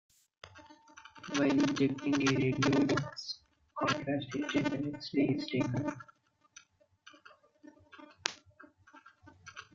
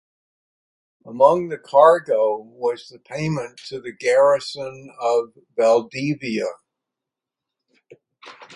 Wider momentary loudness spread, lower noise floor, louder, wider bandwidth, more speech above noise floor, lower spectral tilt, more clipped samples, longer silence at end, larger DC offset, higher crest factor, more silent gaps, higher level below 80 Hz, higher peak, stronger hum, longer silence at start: first, 23 LU vs 18 LU; second, -63 dBFS vs -86 dBFS; second, -33 LUFS vs -20 LUFS; second, 7.6 kHz vs 11 kHz; second, 32 dB vs 66 dB; about the same, -5.5 dB/octave vs -5.5 dB/octave; neither; about the same, 0.1 s vs 0 s; neither; first, 30 dB vs 20 dB; neither; about the same, -68 dBFS vs -66 dBFS; second, -6 dBFS vs 0 dBFS; neither; second, 0.45 s vs 1.05 s